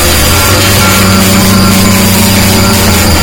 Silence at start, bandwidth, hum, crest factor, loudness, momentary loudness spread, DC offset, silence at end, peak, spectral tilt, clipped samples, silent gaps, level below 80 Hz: 0 s; over 20 kHz; none; 6 dB; -5 LUFS; 1 LU; under 0.1%; 0 s; 0 dBFS; -3.5 dB/octave; 3%; none; -18 dBFS